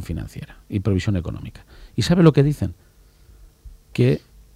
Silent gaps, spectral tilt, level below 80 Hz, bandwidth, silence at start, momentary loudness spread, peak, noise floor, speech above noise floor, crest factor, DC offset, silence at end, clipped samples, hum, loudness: none; -7.5 dB/octave; -42 dBFS; 14 kHz; 0 s; 20 LU; -2 dBFS; -50 dBFS; 30 dB; 20 dB; under 0.1%; 0.4 s; under 0.1%; none; -21 LUFS